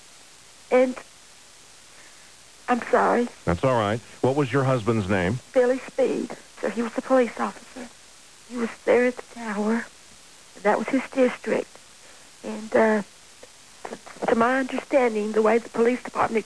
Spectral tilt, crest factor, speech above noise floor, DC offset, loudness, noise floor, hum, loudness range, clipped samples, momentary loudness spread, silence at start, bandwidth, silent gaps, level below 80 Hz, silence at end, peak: -6 dB/octave; 16 dB; 27 dB; 0.3%; -24 LUFS; -50 dBFS; none; 4 LU; under 0.1%; 17 LU; 0.7 s; 11 kHz; none; -58 dBFS; 0 s; -8 dBFS